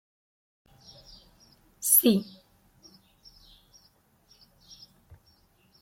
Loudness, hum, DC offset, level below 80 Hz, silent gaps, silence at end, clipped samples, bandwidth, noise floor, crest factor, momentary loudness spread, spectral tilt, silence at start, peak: -22 LUFS; none; under 0.1%; -66 dBFS; none; 3.6 s; under 0.1%; 16.5 kHz; -64 dBFS; 26 dB; 31 LU; -3.5 dB/octave; 1.8 s; -6 dBFS